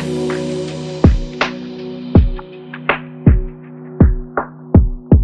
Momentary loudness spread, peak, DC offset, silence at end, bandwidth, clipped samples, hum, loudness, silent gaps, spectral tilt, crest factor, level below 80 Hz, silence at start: 14 LU; 0 dBFS; under 0.1%; 0 s; 9.2 kHz; under 0.1%; none; -17 LUFS; none; -8 dB/octave; 14 dB; -20 dBFS; 0 s